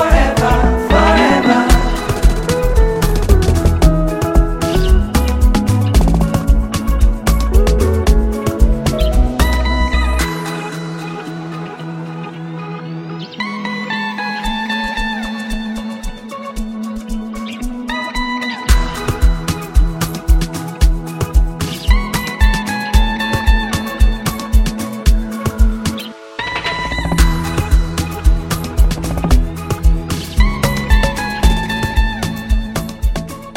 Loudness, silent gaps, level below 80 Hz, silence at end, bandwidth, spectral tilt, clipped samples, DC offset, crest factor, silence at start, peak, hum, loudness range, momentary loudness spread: -16 LUFS; none; -16 dBFS; 0 s; 16.5 kHz; -5.5 dB/octave; under 0.1%; under 0.1%; 14 dB; 0 s; 0 dBFS; none; 8 LU; 12 LU